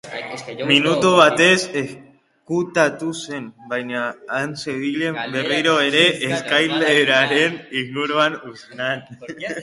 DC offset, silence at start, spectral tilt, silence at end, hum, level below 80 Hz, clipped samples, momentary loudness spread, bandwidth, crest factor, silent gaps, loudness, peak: under 0.1%; 0.05 s; -3.5 dB/octave; 0 s; none; -64 dBFS; under 0.1%; 15 LU; 11.5 kHz; 20 dB; none; -18 LUFS; 0 dBFS